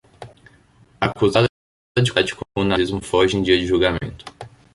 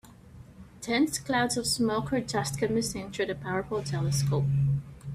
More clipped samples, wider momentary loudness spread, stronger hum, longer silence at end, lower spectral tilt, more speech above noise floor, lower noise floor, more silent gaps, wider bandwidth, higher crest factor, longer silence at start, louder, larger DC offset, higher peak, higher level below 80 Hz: neither; first, 10 LU vs 6 LU; neither; first, 0.25 s vs 0 s; about the same, -5.5 dB/octave vs -5 dB/octave; first, 34 dB vs 22 dB; about the same, -53 dBFS vs -50 dBFS; first, 1.49-1.95 s vs none; second, 11.5 kHz vs 15 kHz; about the same, 18 dB vs 16 dB; first, 0.2 s vs 0.05 s; first, -19 LUFS vs -29 LUFS; neither; first, -2 dBFS vs -14 dBFS; first, -42 dBFS vs -52 dBFS